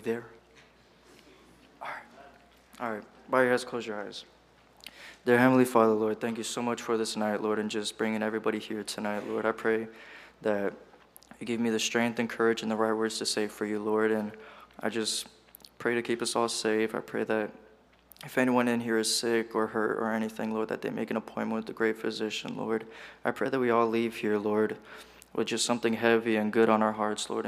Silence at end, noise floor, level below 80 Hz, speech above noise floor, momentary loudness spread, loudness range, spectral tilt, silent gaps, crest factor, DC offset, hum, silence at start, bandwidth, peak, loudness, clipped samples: 0 s; -59 dBFS; -70 dBFS; 30 dB; 15 LU; 6 LU; -4 dB/octave; none; 22 dB; under 0.1%; none; 0 s; 15.5 kHz; -8 dBFS; -29 LUFS; under 0.1%